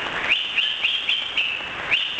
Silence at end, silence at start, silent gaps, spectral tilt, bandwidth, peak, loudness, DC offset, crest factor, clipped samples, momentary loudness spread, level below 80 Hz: 0 s; 0 s; none; -1 dB/octave; 8 kHz; -6 dBFS; -21 LUFS; under 0.1%; 18 dB; under 0.1%; 3 LU; -56 dBFS